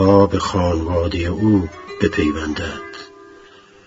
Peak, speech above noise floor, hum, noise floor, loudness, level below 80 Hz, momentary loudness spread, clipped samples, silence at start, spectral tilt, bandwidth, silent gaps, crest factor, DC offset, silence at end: 0 dBFS; 28 dB; none; -45 dBFS; -19 LUFS; -36 dBFS; 16 LU; under 0.1%; 0 s; -7 dB/octave; 7.8 kHz; none; 18 dB; under 0.1%; 0.6 s